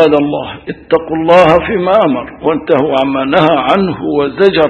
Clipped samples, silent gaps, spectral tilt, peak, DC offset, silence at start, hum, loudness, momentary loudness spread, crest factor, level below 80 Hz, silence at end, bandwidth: 0.7%; none; -7.5 dB/octave; 0 dBFS; under 0.1%; 0 s; none; -11 LUFS; 8 LU; 10 dB; -40 dBFS; 0 s; 9 kHz